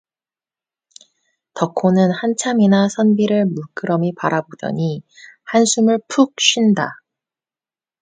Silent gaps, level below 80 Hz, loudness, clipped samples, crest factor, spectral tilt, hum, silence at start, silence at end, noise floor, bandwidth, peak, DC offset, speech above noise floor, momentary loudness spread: none; -64 dBFS; -17 LUFS; under 0.1%; 18 dB; -4.5 dB/octave; none; 1.55 s; 1.1 s; under -90 dBFS; 9.4 kHz; 0 dBFS; under 0.1%; over 74 dB; 11 LU